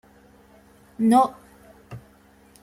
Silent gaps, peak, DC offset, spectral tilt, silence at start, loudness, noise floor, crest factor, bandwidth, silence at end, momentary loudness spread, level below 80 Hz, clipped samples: none; -6 dBFS; under 0.1%; -6 dB/octave; 1 s; -20 LUFS; -54 dBFS; 20 dB; 14 kHz; 0.65 s; 25 LU; -62 dBFS; under 0.1%